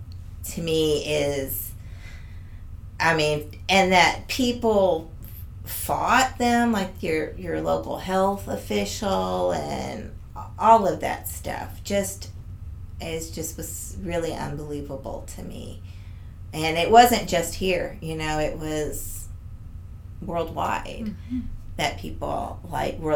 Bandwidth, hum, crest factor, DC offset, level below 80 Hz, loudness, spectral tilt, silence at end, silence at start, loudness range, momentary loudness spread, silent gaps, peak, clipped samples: 19 kHz; none; 24 dB; under 0.1%; -40 dBFS; -24 LUFS; -4 dB/octave; 0 s; 0 s; 9 LU; 21 LU; none; 0 dBFS; under 0.1%